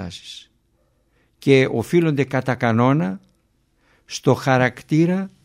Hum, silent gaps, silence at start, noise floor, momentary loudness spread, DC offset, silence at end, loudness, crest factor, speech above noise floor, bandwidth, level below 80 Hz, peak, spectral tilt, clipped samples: none; none; 0 s; -64 dBFS; 17 LU; under 0.1%; 0.15 s; -19 LUFS; 20 dB; 45 dB; 16 kHz; -58 dBFS; -2 dBFS; -6.5 dB/octave; under 0.1%